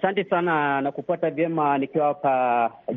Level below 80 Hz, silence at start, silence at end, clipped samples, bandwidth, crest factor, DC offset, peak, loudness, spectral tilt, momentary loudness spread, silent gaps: -70 dBFS; 0 s; 0 s; under 0.1%; 4 kHz; 14 dB; under 0.1%; -8 dBFS; -23 LUFS; -4.5 dB/octave; 5 LU; none